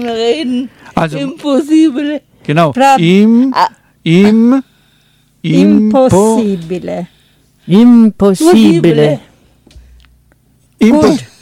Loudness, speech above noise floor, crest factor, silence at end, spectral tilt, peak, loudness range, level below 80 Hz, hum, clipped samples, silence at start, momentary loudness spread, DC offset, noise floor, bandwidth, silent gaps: -9 LUFS; 43 dB; 10 dB; 0.15 s; -6.5 dB/octave; 0 dBFS; 2 LU; -44 dBFS; none; under 0.1%; 0 s; 13 LU; under 0.1%; -51 dBFS; 15 kHz; none